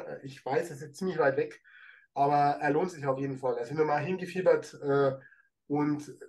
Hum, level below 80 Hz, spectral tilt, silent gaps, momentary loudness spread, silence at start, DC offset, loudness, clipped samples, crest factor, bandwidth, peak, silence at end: none; -78 dBFS; -7 dB/octave; none; 11 LU; 0 s; under 0.1%; -30 LUFS; under 0.1%; 18 dB; 12.5 kHz; -12 dBFS; 0 s